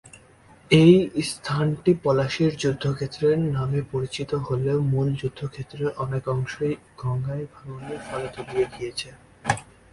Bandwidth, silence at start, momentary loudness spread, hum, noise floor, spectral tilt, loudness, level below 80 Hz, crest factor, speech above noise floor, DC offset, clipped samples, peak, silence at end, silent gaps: 11.5 kHz; 0.05 s; 13 LU; none; -52 dBFS; -6.5 dB/octave; -24 LUFS; -52 dBFS; 22 dB; 29 dB; under 0.1%; under 0.1%; -2 dBFS; 0.3 s; none